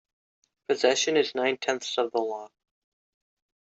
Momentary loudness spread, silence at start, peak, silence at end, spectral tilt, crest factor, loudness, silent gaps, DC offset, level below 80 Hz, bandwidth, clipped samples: 11 LU; 0.7 s; -8 dBFS; 1.2 s; -2 dB/octave; 22 dB; -26 LUFS; none; under 0.1%; -78 dBFS; 8.2 kHz; under 0.1%